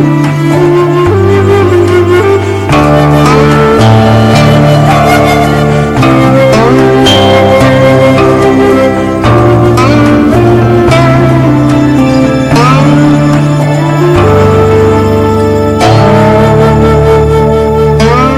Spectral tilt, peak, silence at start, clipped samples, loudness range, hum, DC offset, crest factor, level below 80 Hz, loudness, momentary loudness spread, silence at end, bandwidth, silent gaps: -7 dB/octave; 0 dBFS; 0 s; 0.7%; 1 LU; none; under 0.1%; 4 dB; -22 dBFS; -5 LUFS; 3 LU; 0 s; 15.5 kHz; none